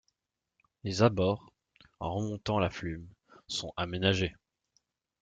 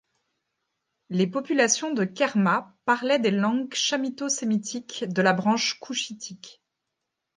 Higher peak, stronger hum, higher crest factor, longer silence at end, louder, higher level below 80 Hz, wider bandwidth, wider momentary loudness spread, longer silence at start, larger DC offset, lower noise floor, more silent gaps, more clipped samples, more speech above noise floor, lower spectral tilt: second, -10 dBFS vs -6 dBFS; neither; about the same, 24 dB vs 20 dB; about the same, 0.9 s vs 0.85 s; second, -32 LUFS vs -25 LUFS; first, -58 dBFS vs -76 dBFS; about the same, 9.2 kHz vs 10 kHz; first, 13 LU vs 10 LU; second, 0.85 s vs 1.1 s; neither; first, -86 dBFS vs -82 dBFS; neither; neither; about the same, 56 dB vs 57 dB; first, -5.5 dB/octave vs -3.5 dB/octave